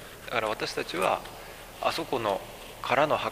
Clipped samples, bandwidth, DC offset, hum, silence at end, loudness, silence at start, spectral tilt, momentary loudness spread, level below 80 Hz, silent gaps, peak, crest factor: under 0.1%; 15.5 kHz; under 0.1%; none; 0 s; -29 LUFS; 0 s; -3.5 dB/octave; 17 LU; -54 dBFS; none; -8 dBFS; 22 dB